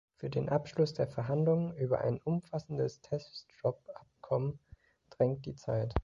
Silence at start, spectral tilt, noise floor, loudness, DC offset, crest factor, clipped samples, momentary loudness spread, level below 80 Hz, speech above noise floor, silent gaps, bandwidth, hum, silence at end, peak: 0.2 s; -8.5 dB/octave; -59 dBFS; -34 LUFS; under 0.1%; 22 dB; under 0.1%; 9 LU; -52 dBFS; 26 dB; none; 7.6 kHz; none; 0 s; -12 dBFS